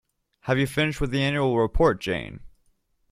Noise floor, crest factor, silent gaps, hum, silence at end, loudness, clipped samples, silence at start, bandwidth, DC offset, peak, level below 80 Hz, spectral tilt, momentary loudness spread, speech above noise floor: -67 dBFS; 18 dB; none; none; 0.65 s; -24 LUFS; under 0.1%; 0.45 s; 15 kHz; under 0.1%; -6 dBFS; -38 dBFS; -6 dB/octave; 9 LU; 43 dB